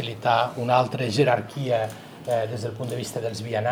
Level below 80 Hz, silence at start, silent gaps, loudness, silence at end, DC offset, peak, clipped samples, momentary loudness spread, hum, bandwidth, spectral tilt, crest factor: -66 dBFS; 0 s; none; -25 LUFS; 0 s; under 0.1%; -6 dBFS; under 0.1%; 9 LU; none; 18 kHz; -5.5 dB/octave; 20 dB